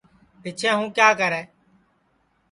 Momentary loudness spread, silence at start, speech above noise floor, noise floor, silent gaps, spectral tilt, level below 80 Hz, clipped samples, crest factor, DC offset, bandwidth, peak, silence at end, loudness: 17 LU; 0.45 s; 45 dB; -66 dBFS; none; -3 dB/octave; -68 dBFS; under 0.1%; 22 dB; under 0.1%; 11.5 kHz; -2 dBFS; 1.05 s; -20 LUFS